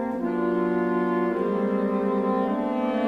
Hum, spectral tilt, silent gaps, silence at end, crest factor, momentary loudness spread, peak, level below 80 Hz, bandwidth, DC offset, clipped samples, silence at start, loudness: none; -9 dB/octave; none; 0 s; 12 dB; 2 LU; -12 dBFS; -60 dBFS; 6 kHz; under 0.1%; under 0.1%; 0 s; -25 LUFS